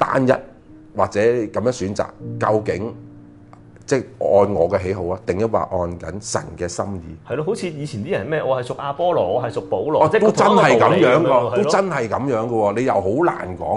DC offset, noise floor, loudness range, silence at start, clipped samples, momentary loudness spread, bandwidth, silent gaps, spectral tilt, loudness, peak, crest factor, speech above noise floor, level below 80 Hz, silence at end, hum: under 0.1%; -44 dBFS; 8 LU; 0 s; under 0.1%; 13 LU; 11.5 kHz; none; -6 dB/octave; -19 LUFS; 0 dBFS; 18 dB; 25 dB; -46 dBFS; 0 s; none